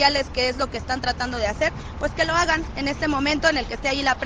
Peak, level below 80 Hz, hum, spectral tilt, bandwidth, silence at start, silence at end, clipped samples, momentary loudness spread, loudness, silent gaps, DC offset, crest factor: -4 dBFS; -36 dBFS; none; -3.5 dB/octave; 9.6 kHz; 0 s; 0 s; under 0.1%; 6 LU; -23 LUFS; none; under 0.1%; 20 dB